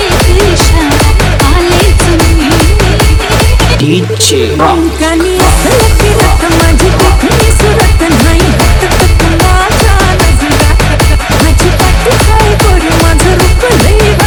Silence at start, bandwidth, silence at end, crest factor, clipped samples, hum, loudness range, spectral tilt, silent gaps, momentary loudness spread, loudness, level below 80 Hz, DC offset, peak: 0 s; over 20 kHz; 0 s; 6 dB; 5%; none; 1 LU; -4.5 dB/octave; none; 1 LU; -7 LUFS; -10 dBFS; under 0.1%; 0 dBFS